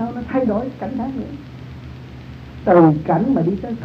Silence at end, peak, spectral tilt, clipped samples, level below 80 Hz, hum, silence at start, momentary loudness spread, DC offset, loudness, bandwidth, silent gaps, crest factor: 0 s; 0 dBFS; -10 dB/octave; under 0.1%; -42 dBFS; none; 0 s; 23 LU; under 0.1%; -18 LUFS; 6.2 kHz; none; 18 dB